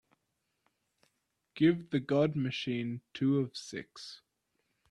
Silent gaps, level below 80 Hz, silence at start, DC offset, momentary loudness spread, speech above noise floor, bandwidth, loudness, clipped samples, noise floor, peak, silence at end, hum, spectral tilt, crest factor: none; -72 dBFS; 1.55 s; under 0.1%; 18 LU; 50 dB; 11 kHz; -32 LUFS; under 0.1%; -82 dBFS; -16 dBFS; 0.75 s; none; -6.5 dB/octave; 20 dB